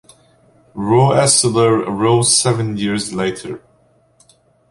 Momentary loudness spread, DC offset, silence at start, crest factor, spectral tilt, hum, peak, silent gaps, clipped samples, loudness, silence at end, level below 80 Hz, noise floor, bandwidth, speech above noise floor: 17 LU; under 0.1%; 0.75 s; 16 dB; -4 dB/octave; none; 0 dBFS; none; under 0.1%; -14 LUFS; 1.15 s; -52 dBFS; -55 dBFS; 11.5 kHz; 40 dB